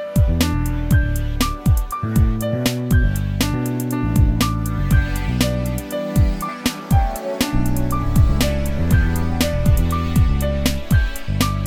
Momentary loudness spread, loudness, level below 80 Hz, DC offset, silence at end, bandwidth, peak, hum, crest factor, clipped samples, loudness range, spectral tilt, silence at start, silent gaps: 5 LU; -20 LUFS; -22 dBFS; under 0.1%; 0 s; 17.5 kHz; -2 dBFS; none; 14 dB; under 0.1%; 1 LU; -6 dB/octave; 0 s; none